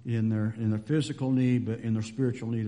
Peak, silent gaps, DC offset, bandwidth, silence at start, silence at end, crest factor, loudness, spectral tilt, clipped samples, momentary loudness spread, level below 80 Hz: -16 dBFS; none; under 0.1%; 10.5 kHz; 0.05 s; 0 s; 12 dB; -29 LUFS; -7.5 dB/octave; under 0.1%; 5 LU; -64 dBFS